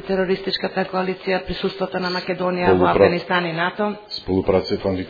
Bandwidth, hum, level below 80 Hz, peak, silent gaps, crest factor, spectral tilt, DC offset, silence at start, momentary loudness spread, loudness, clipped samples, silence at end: 5 kHz; none; -46 dBFS; 0 dBFS; none; 20 dB; -7.5 dB/octave; under 0.1%; 0 s; 8 LU; -21 LUFS; under 0.1%; 0 s